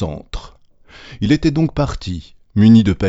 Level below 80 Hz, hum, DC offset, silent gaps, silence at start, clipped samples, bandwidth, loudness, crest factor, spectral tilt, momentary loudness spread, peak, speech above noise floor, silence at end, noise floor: -34 dBFS; none; under 0.1%; none; 0 s; under 0.1%; 8 kHz; -15 LUFS; 16 dB; -7.5 dB/octave; 20 LU; 0 dBFS; 30 dB; 0 s; -44 dBFS